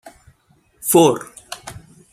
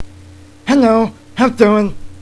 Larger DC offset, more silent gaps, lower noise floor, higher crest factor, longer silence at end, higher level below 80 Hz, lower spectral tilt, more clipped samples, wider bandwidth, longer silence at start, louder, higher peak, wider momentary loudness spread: neither; neither; first, -58 dBFS vs -39 dBFS; first, 20 dB vs 14 dB; first, 0.35 s vs 0 s; second, -56 dBFS vs -40 dBFS; second, -4.5 dB/octave vs -6.5 dB/octave; neither; first, 16 kHz vs 11 kHz; first, 0.85 s vs 0 s; second, -16 LUFS vs -13 LUFS; about the same, -2 dBFS vs 0 dBFS; first, 20 LU vs 10 LU